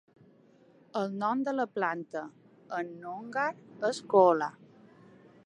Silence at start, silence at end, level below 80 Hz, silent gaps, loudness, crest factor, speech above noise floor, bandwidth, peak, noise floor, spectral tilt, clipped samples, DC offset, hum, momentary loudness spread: 0.95 s; 0.95 s; -86 dBFS; none; -31 LUFS; 24 dB; 31 dB; 11 kHz; -8 dBFS; -61 dBFS; -5.5 dB/octave; under 0.1%; under 0.1%; none; 16 LU